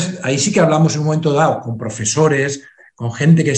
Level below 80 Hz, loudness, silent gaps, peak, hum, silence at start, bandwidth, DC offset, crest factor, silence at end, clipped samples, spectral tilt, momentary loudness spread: -54 dBFS; -16 LUFS; none; 0 dBFS; none; 0 s; 9.4 kHz; under 0.1%; 14 dB; 0 s; under 0.1%; -5.5 dB/octave; 12 LU